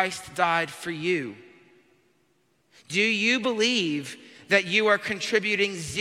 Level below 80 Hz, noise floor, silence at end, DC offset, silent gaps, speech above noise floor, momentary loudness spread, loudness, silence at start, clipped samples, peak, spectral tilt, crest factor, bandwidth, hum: -66 dBFS; -68 dBFS; 0 s; under 0.1%; none; 43 dB; 10 LU; -24 LUFS; 0 s; under 0.1%; -6 dBFS; -3 dB/octave; 20 dB; 15.5 kHz; none